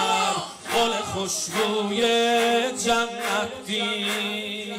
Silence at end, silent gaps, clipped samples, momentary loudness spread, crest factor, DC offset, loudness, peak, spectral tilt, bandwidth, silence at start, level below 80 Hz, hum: 0 s; none; under 0.1%; 7 LU; 12 dB; under 0.1%; -23 LUFS; -12 dBFS; -2.5 dB/octave; 16 kHz; 0 s; -60 dBFS; none